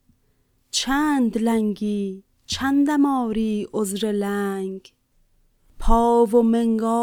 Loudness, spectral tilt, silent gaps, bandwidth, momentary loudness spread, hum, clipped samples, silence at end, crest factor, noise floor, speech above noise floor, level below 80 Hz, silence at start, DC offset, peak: -21 LUFS; -5 dB/octave; none; 17.5 kHz; 12 LU; none; under 0.1%; 0 s; 18 dB; -64 dBFS; 44 dB; -34 dBFS; 0.75 s; under 0.1%; -4 dBFS